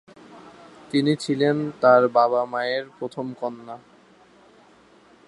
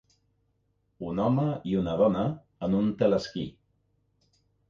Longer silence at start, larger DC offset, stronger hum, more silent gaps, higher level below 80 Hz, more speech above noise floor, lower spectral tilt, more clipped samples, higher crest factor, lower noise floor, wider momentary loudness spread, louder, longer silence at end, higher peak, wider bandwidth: second, 0.3 s vs 1 s; neither; second, none vs 50 Hz at -50 dBFS; neither; second, -70 dBFS vs -56 dBFS; second, 32 dB vs 46 dB; second, -6 dB/octave vs -8.5 dB/octave; neither; about the same, 20 dB vs 18 dB; second, -54 dBFS vs -73 dBFS; first, 17 LU vs 11 LU; first, -22 LUFS vs -28 LUFS; first, 1.5 s vs 1.2 s; first, -4 dBFS vs -10 dBFS; first, 11.5 kHz vs 7.4 kHz